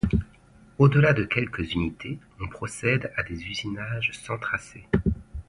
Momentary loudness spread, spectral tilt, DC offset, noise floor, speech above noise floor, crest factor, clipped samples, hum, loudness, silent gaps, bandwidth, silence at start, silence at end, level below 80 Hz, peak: 16 LU; -6.5 dB/octave; under 0.1%; -54 dBFS; 28 dB; 20 dB; under 0.1%; none; -26 LUFS; none; 11.5 kHz; 0.05 s; 0.05 s; -40 dBFS; -6 dBFS